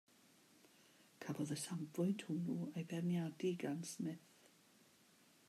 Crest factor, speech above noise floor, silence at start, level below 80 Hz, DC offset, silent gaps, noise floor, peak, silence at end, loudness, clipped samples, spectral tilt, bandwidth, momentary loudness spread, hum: 16 dB; 28 dB; 1.2 s; under -90 dBFS; under 0.1%; none; -70 dBFS; -30 dBFS; 1.3 s; -44 LUFS; under 0.1%; -6 dB/octave; 14.5 kHz; 7 LU; none